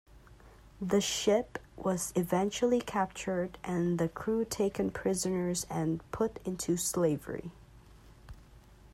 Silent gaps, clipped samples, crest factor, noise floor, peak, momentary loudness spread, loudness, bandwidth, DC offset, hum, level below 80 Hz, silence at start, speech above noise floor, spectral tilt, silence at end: none; under 0.1%; 18 dB; -56 dBFS; -14 dBFS; 8 LU; -32 LUFS; 16 kHz; under 0.1%; none; -56 dBFS; 0.15 s; 24 dB; -5 dB/octave; 0.05 s